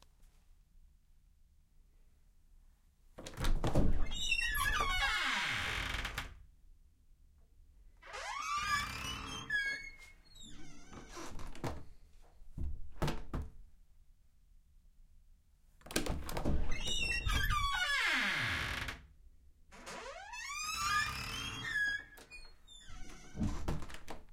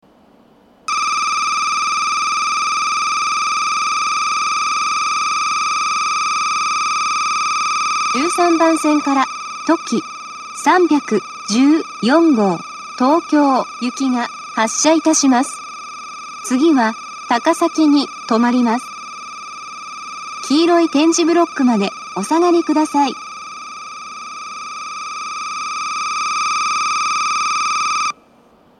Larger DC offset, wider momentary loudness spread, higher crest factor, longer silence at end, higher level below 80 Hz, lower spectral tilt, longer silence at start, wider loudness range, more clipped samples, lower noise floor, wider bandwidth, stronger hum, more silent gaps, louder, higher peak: neither; first, 21 LU vs 16 LU; first, 24 dB vs 16 dB; second, 0 s vs 0.65 s; first, -44 dBFS vs -68 dBFS; about the same, -3 dB/octave vs -2.5 dB/octave; second, 0.2 s vs 0.9 s; first, 12 LU vs 4 LU; neither; first, -65 dBFS vs -50 dBFS; first, 16.5 kHz vs 12.5 kHz; neither; neither; second, -37 LUFS vs -16 LUFS; second, -14 dBFS vs 0 dBFS